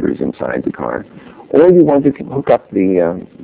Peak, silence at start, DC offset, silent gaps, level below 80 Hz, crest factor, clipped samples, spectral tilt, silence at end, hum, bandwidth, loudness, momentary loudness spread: 0 dBFS; 0 s; under 0.1%; none; -46 dBFS; 14 dB; 0.4%; -12.5 dB/octave; 0 s; none; 4 kHz; -14 LUFS; 13 LU